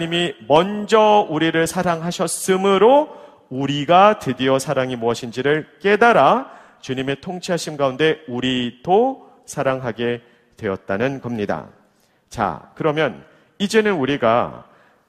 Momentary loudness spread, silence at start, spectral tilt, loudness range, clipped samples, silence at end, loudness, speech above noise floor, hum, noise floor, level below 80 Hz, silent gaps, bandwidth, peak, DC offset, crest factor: 13 LU; 0 s; -5 dB/octave; 8 LU; under 0.1%; 0.45 s; -19 LUFS; 41 dB; none; -59 dBFS; -56 dBFS; none; 15.5 kHz; 0 dBFS; under 0.1%; 18 dB